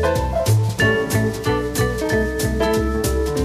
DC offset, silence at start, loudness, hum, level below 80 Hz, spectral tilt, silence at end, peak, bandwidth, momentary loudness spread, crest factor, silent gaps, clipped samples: under 0.1%; 0 s; -19 LUFS; none; -28 dBFS; -5.5 dB/octave; 0 s; -4 dBFS; 15.5 kHz; 4 LU; 14 dB; none; under 0.1%